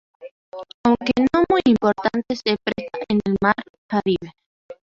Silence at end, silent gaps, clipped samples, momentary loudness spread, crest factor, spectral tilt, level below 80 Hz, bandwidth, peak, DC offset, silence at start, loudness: 0.2 s; 0.31-0.52 s, 0.74-0.84 s, 3.70-3.89 s, 4.46-4.69 s; under 0.1%; 12 LU; 18 dB; -6.5 dB/octave; -50 dBFS; 7.4 kHz; -2 dBFS; under 0.1%; 0.2 s; -20 LUFS